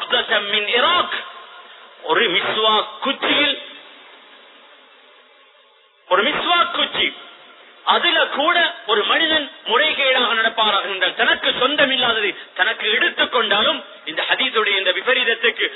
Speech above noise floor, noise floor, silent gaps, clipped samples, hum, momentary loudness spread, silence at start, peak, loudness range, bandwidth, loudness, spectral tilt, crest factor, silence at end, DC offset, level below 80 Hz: 35 dB; -53 dBFS; none; under 0.1%; none; 8 LU; 0 s; 0 dBFS; 6 LU; 4.1 kHz; -17 LUFS; -7 dB/octave; 20 dB; 0 s; under 0.1%; -62 dBFS